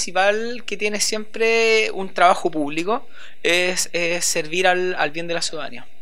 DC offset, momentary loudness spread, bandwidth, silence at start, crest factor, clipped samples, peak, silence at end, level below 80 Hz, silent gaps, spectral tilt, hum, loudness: 4%; 9 LU; 16.5 kHz; 0 s; 20 dB; under 0.1%; 0 dBFS; 0.2 s; -66 dBFS; none; -2 dB/octave; none; -20 LUFS